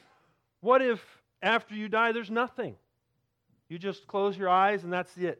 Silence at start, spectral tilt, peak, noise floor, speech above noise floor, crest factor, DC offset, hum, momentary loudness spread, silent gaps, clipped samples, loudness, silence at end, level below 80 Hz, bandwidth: 0.65 s; -6 dB/octave; -10 dBFS; -78 dBFS; 50 dB; 20 dB; under 0.1%; none; 13 LU; none; under 0.1%; -28 LUFS; 0.05 s; -80 dBFS; 10.5 kHz